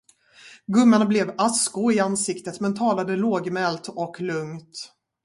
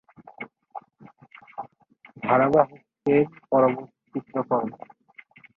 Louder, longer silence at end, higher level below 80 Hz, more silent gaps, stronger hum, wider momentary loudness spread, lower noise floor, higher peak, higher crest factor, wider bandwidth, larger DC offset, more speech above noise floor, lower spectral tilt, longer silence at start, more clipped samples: about the same, -22 LUFS vs -24 LUFS; second, 0.4 s vs 0.8 s; about the same, -68 dBFS vs -64 dBFS; neither; neither; second, 18 LU vs 23 LU; second, -50 dBFS vs -56 dBFS; about the same, -6 dBFS vs -4 dBFS; about the same, 18 dB vs 22 dB; first, 11.5 kHz vs 6.2 kHz; neither; second, 28 dB vs 34 dB; second, -4.5 dB/octave vs -9.5 dB/octave; first, 0.45 s vs 0.2 s; neither